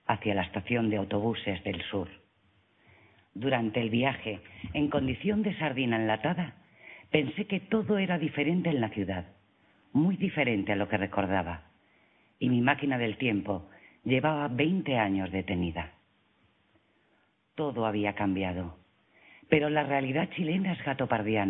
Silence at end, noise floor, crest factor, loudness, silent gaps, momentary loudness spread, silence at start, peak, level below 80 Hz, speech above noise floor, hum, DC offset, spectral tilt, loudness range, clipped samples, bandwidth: 0 s; -70 dBFS; 22 dB; -30 LUFS; none; 10 LU; 0.1 s; -8 dBFS; -58 dBFS; 41 dB; none; under 0.1%; -10.5 dB/octave; 4 LU; under 0.1%; 4 kHz